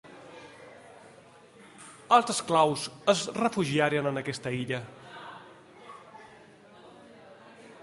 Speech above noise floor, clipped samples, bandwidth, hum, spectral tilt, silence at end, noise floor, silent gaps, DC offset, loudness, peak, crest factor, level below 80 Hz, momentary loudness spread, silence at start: 27 dB; under 0.1%; 11.5 kHz; none; -4 dB/octave; 0.1 s; -54 dBFS; none; under 0.1%; -27 LUFS; -6 dBFS; 24 dB; -70 dBFS; 26 LU; 0.1 s